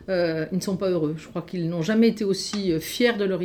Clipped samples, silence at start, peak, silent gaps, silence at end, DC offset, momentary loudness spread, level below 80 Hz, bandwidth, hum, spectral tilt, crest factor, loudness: under 0.1%; 0 s; -8 dBFS; none; 0 s; under 0.1%; 8 LU; -56 dBFS; 19.5 kHz; none; -5.5 dB/octave; 16 dB; -24 LUFS